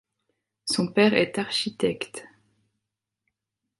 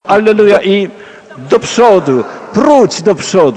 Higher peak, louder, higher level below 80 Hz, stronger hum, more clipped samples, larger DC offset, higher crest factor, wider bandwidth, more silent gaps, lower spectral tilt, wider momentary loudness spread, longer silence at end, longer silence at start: second, -6 dBFS vs 0 dBFS; second, -24 LUFS vs -9 LUFS; second, -66 dBFS vs -50 dBFS; neither; second, under 0.1% vs 0.9%; neither; first, 22 dB vs 10 dB; first, 11.5 kHz vs 10 kHz; neither; about the same, -4 dB/octave vs -5 dB/octave; first, 16 LU vs 8 LU; first, 1.55 s vs 0 s; first, 0.65 s vs 0.05 s